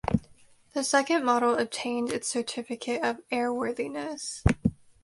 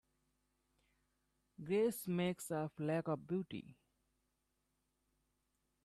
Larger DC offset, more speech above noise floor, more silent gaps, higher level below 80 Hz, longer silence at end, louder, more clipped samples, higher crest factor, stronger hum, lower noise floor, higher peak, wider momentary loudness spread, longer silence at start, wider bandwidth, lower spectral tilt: neither; second, 29 dB vs 45 dB; neither; first, -44 dBFS vs -78 dBFS; second, 0.3 s vs 2.1 s; first, -28 LUFS vs -40 LUFS; neither; about the same, 22 dB vs 18 dB; neither; second, -57 dBFS vs -85 dBFS; first, -6 dBFS vs -26 dBFS; about the same, 10 LU vs 11 LU; second, 0.05 s vs 1.6 s; second, 11.5 kHz vs 13.5 kHz; second, -4.5 dB/octave vs -6 dB/octave